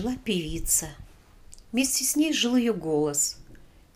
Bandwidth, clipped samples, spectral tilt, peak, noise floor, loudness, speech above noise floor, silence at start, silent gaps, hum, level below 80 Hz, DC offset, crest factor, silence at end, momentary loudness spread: 16 kHz; under 0.1%; -2.5 dB/octave; -12 dBFS; -50 dBFS; -25 LUFS; 25 dB; 0 s; none; none; -44 dBFS; under 0.1%; 16 dB; 0.3 s; 7 LU